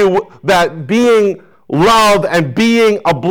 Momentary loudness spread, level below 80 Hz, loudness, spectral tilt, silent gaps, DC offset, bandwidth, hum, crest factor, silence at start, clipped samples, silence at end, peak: 8 LU; -42 dBFS; -11 LUFS; -5 dB/octave; none; under 0.1%; over 20 kHz; none; 6 dB; 0 s; under 0.1%; 0 s; -6 dBFS